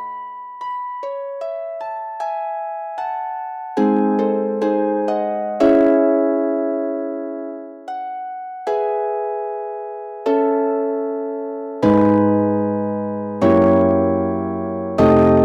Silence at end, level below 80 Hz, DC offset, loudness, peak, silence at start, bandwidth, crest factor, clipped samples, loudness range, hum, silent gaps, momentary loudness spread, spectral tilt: 0 s; -50 dBFS; under 0.1%; -19 LUFS; -6 dBFS; 0 s; 7.6 kHz; 14 dB; under 0.1%; 8 LU; none; none; 14 LU; -9 dB/octave